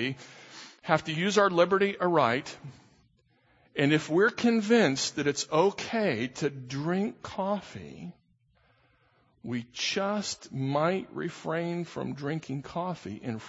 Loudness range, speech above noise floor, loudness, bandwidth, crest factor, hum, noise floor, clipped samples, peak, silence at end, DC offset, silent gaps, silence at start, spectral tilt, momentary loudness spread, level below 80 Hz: 8 LU; 39 dB; -28 LUFS; 8 kHz; 22 dB; none; -67 dBFS; under 0.1%; -8 dBFS; 0 s; under 0.1%; none; 0 s; -5 dB/octave; 19 LU; -68 dBFS